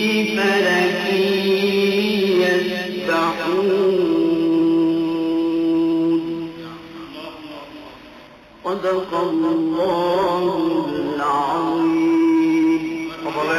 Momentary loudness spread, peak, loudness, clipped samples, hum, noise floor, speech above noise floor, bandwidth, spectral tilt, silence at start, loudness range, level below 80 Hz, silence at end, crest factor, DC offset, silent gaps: 17 LU; -6 dBFS; -19 LUFS; under 0.1%; none; -43 dBFS; 25 dB; 14.5 kHz; -5.5 dB/octave; 0 s; 7 LU; -56 dBFS; 0 s; 12 dB; under 0.1%; none